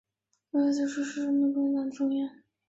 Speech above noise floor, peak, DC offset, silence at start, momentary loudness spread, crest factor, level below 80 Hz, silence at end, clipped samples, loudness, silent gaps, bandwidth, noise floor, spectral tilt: 34 dB; -16 dBFS; under 0.1%; 0.55 s; 6 LU; 12 dB; -78 dBFS; 0.35 s; under 0.1%; -29 LUFS; none; 8 kHz; -61 dBFS; -4.5 dB/octave